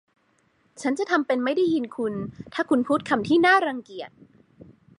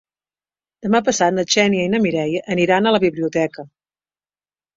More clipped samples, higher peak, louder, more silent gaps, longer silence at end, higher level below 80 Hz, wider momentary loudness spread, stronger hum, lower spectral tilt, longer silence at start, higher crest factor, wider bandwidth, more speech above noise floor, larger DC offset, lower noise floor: neither; second, -6 dBFS vs -2 dBFS; second, -23 LUFS vs -18 LUFS; neither; second, 0.35 s vs 1.1 s; second, -64 dBFS vs -58 dBFS; first, 16 LU vs 7 LU; second, none vs 50 Hz at -60 dBFS; about the same, -5 dB/octave vs -4.5 dB/octave; about the same, 0.8 s vs 0.85 s; about the same, 18 dB vs 18 dB; first, 11 kHz vs 7.8 kHz; second, 42 dB vs over 73 dB; neither; second, -66 dBFS vs under -90 dBFS